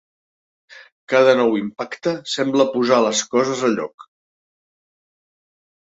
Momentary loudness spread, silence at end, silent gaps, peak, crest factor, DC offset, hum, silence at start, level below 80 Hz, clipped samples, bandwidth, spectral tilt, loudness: 10 LU; 1.85 s; 0.92-1.08 s, 3.94-3.98 s; -2 dBFS; 18 dB; under 0.1%; none; 0.75 s; -68 dBFS; under 0.1%; 8 kHz; -3.5 dB/octave; -18 LUFS